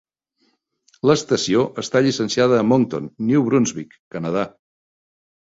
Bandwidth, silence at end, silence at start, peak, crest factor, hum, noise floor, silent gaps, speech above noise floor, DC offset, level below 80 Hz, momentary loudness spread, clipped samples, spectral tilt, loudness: 8 kHz; 0.95 s; 1.05 s; -2 dBFS; 18 dB; none; -67 dBFS; 3.99-4.11 s; 48 dB; under 0.1%; -58 dBFS; 10 LU; under 0.1%; -5.5 dB/octave; -19 LUFS